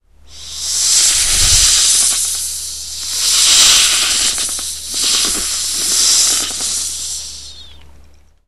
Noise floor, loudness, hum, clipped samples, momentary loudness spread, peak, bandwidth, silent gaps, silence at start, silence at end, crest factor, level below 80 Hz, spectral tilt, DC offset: -45 dBFS; -11 LUFS; none; under 0.1%; 14 LU; 0 dBFS; over 20 kHz; none; 0.3 s; 0.8 s; 16 dB; -32 dBFS; 1.5 dB/octave; 1%